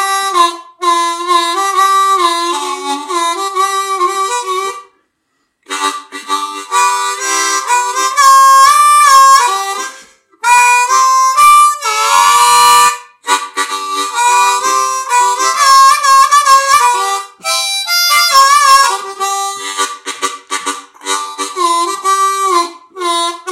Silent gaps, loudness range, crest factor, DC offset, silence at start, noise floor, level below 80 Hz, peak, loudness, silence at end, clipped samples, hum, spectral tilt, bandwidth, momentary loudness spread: none; 9 LU; 10 dB; under 0.1%; 0 s; -65 dBFS; -58 dBFS; 0 dBFS; -10 LUFS; 0 s; 0.3%; none; 2 dB/octave; 16.5 kHz; 13 LU